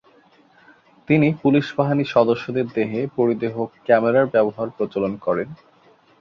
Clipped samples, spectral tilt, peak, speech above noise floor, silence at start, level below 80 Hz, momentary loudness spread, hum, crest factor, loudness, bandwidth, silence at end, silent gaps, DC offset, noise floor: under 0.1%; -8.5 dB/octave; -2 dBFS; 35 dB; 1.1 s; -60 dBFS; 8 LU; none; 18 dB; -20 LUFS; 6.8 kHz; 0.65 s; none; under 0.1%; -54 dBFS